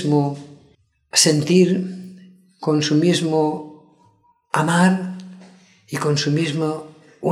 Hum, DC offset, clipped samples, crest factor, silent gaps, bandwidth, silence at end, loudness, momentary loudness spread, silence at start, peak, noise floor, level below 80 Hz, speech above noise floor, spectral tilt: none; under 0.1%; under 0.1%; 18 dB; none; 15.5 kHz; 0 s; -19 LUFS; 17 LU; 0 s; -2 dBFS; -58 dBFS; -68 dBFS; 40 dB; -4.5 dB/octave